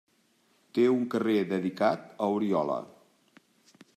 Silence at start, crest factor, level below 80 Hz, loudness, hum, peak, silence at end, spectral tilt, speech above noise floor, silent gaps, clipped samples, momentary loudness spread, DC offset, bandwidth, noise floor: 0.75 s; 18 dB; -80 dBFS; -28 LUFS; none; -12 dBFS; 1.1 s; -7 dB/octave; 41 dB; none; under 0.1%; 8 LU; under 0.1%; 13.5 kHz; -68 dBFS